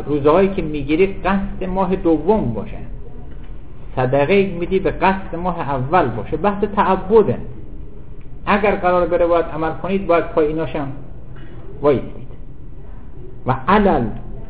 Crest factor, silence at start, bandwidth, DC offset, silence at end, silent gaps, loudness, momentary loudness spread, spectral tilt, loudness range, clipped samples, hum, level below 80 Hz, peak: 18 dB; 0 s; 4 kHz; 4%; 0 s; none; -18 LUFS; 23 LU; -11 dB/octave; 4 LU; under 0.1%; none; -34 dBFS; -2 dBFS